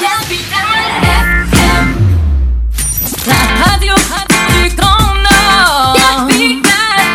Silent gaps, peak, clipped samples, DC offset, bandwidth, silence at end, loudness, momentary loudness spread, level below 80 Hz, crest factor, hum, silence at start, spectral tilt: none; 0 dBFS; 0.2%; under 0.1%; over 20 kHz; 0 s; -9 LUFS; 6 LU; -16 dBFS; 10 dB; none; 0 s; -3.5 dB/octave